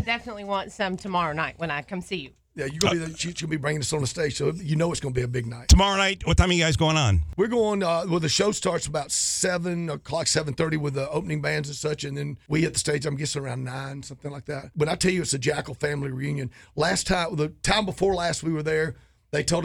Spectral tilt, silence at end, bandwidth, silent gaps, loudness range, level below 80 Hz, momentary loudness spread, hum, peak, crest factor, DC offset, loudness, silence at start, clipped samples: -4 dB/octave; 0 s; 17 kHz; none; 6 LU; -36 dBFS; 11 LU; none; -6 dBFS; 20 dB; under 0.1%; -25 LUFS; 0 s; under 0.1%